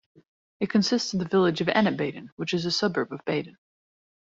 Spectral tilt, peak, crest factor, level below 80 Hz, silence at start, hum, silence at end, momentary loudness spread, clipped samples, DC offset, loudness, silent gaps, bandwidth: -5 dB/octave; -8 dBFS; 20 dB; -66 dBFS; 0.6 s; none; 0.8 s; 9 LU; under 0.1%; under 0.1%; -26 LUFS; 2.32-2.37 s; 7.8 kHz